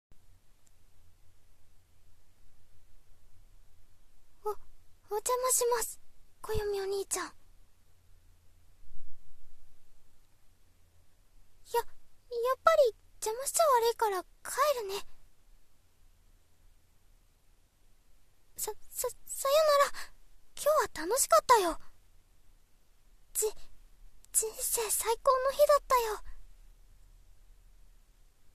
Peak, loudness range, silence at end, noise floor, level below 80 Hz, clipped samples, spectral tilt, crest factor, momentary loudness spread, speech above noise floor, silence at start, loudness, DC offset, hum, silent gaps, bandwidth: -8 dBFS; 14 LU; 1.15 s; -64 dBFS; -56 dBFS; under 0.1%; -1.5 dB/octave; 26 dB; 16 LU; 34 dB; 0.1 s; -30 LUFS; under 0.1%; none; none; 14 kHz